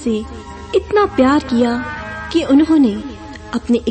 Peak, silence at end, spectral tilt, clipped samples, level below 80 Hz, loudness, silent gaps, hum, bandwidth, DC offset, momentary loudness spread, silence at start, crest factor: -2 dBFS; 0 s; -6 dB/octave; under 0.1%; -38 dBFS; -16 LUFS; none; none; 8.8 kHz; under 0.1%; 16 LU; 0 s; 14 dB